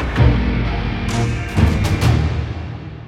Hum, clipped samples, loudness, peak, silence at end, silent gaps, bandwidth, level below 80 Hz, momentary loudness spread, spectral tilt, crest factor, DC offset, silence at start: none; under 0.1%; -18 LUFS; -2 dBFS; 0 s; none; 14 kHz; -24 dBFS; 10 LU; -6.5 dB/octave; 16 dB; under 0.1%; 0 s